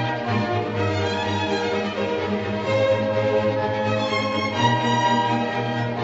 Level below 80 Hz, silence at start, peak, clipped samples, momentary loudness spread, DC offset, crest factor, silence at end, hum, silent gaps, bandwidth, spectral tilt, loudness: -56 dBFS; 0 s; -6 dBFS; under 0.1%; 5 LU; under 0.1%; 16 dB; 0 s; none; none; 8 kHz; -6 dB/octave; -22 LUFS